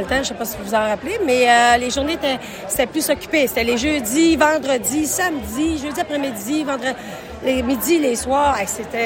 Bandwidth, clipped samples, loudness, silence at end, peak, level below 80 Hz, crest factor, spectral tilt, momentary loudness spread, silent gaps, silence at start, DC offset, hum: 17 kHz; under 0.1%; -18 LUFS; 0 s; -2 dBFS; -42 dBFS; 16 dB; -3 dB/octave; 9 LU; none; 0 s; under 0.1%; none